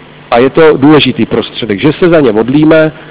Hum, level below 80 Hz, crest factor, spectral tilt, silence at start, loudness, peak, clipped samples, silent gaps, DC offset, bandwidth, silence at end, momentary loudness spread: none; -38 dBFS; 6 dB; -10.5 dB/octave; 0.3 s; -7 LUFS; 0 dBFS; under 0.1%; none; under 0.1%; 4 kHz; 0 s; 7 LU